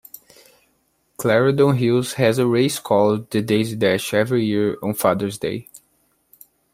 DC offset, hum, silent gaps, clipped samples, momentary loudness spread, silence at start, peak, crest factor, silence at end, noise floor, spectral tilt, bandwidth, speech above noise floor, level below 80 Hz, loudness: under 0.1%; none; none; under 0.1%; 7 LU; 1.2 s; -2 dBFS; 18 dB; 0.95 s; -65 dBFS; -5.5 dB/octave; 16 kHz; 47 dB; -60 dBFS; -19 LUFS